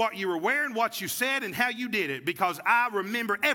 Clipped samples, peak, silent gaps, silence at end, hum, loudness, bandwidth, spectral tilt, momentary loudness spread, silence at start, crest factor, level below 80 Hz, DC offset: under 0.1%; -10 dBFS; none; 0 s; none; -27 LUFS; 18 kHz; -3 dB/octave; 5 LU; 0 s; 18 dB; -78 dBFS; under 0.1%